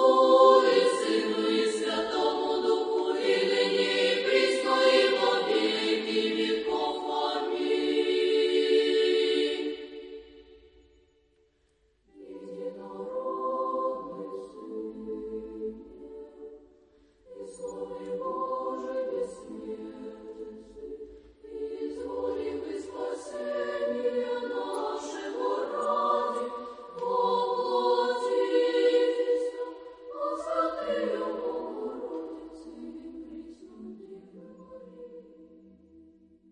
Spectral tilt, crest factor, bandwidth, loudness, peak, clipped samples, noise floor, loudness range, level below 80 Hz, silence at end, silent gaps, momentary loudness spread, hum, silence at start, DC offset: -3.5 dB/octave; 22 dB; 11 kHz; -28 LUFS; -8 dBFS; under 0.1%; -69 dBFS; 16 LU; -66 dBFS; 0.5 s; none; 21 LU; none; 0 s; under 0.1%